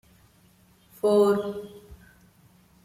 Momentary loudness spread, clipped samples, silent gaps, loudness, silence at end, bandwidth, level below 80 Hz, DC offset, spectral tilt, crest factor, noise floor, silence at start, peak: 19 LU; under 0.1%; none; -24 LUFS; 0.9 s; 15 kHz; -60 dBFS; under 0.1%; -6.5 dB/octave; 20 dB; -59 dBFS; 1.05 s; -10 dBFS